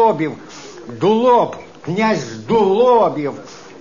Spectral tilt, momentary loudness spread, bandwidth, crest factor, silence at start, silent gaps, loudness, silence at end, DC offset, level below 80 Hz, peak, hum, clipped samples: -6 dB/octave; 21 LU; 7.4 kHz; 14 dB; 0 s; none; -16 LUFS; 0.05 s; 0.4%; -54 dBFS; -2 dBFS; none; under 0.1%